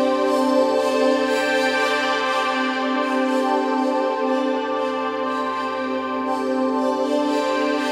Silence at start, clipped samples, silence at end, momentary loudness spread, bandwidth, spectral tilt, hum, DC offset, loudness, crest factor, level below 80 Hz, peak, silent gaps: 0 s; under 0.1%; 0 s; 5 LU; 15 kHz; -3 dB/octave; none; under 0.1%; -21 LUFS; 14 dB; -76 dBFS; -8 dBFS; none